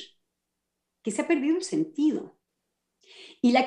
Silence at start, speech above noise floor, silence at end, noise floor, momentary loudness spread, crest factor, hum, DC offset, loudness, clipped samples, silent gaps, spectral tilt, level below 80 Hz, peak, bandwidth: 0 s; 57 dB; 0 s; -82 dBFS; 23 LU; 18 dB; none; under 0.1%; -27 LUFS; under 0.1%; none; -4.5 dB/octave; -80 dBFS; -10 dBFS; 11 kHz